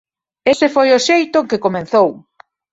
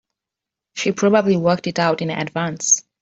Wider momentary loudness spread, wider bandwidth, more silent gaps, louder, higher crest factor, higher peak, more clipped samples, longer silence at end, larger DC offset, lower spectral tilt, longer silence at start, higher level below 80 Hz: about the same, 6 LU vs 8 LU; about the same, 8 kHz vs 8 kHz; neither; first, -14 LUFS vs -18 LUFS; about the same, 14 dB vs 18 dB; about the same, -2 dBFS vs -2 dBFS; neither; first, 0.55 s vs 0.2 s; neither; about the same, -4 dB/octave vs -4 dB/octave; second, 0.45 s vs 0.75 s; about the same, -58 dBFS vs -62 dBFS